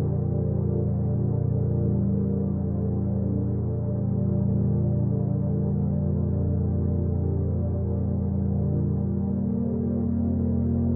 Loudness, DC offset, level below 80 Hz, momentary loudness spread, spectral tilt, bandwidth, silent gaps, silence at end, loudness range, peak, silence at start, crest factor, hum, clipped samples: -26 LUFS; under 0.1%; -40 dBFS; 2 LU; -14 dB/octave; 1.9 kHz; none; 0 s; 1 LU; -14 dBFS; 0 s; 10 dB; none; under 0.1%